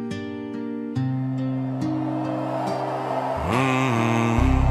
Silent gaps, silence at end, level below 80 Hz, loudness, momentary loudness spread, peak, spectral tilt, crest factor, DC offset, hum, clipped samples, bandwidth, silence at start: none; 0 s; -32 dBFS; -24 LUFS; 10 LU; -6 dBFS; -7 dB/octave; 16 dB; under 0.1%; none; under 0.1%; 13 kHz; 0 s